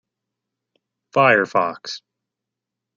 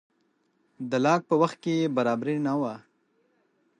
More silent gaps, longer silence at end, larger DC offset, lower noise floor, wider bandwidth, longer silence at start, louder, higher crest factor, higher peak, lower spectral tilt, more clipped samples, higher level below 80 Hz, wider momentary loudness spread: neither; about the same, 1 s vs 1 s; neither; first, -84 dBFS vs -71 dBFS; second, 7.6 kHz vs 9.8 kHz; first, 1.15 s vs 0.8 s; first, -18 LUFS vs -26 LUFS; about the same, 20 dB vs 20 dB; first, -2 dBFS vs -8 dBFS; second, -5 dB/octave vs -6.5 dB/octave; neither; about the same, -72 dBFS vs -76 dBFS; first, 17 LU vs 10 LU